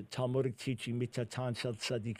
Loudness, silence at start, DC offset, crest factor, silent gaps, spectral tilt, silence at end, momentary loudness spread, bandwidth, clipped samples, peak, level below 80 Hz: -37 LUFS; 0 s; under 0.1%; 16 dB; none; -5.5 dB/octave; 0 s; 4 LU; 15.5 kHz; under 0.1%; -20 dBFS; -68 dBFS